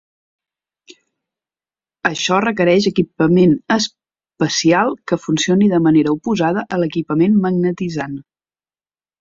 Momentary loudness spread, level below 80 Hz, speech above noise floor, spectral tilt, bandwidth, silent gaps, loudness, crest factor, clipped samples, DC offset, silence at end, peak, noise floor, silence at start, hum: 9 LU; -56 dBFS; over 75 dB; -5.5 dB/octave; 7.8 kHz; none; -16 LUFS; 16 dB; under 0.1%; under 0.1%; 1 s; -2 dBFS; under -90 dBFS; 2.05 s; none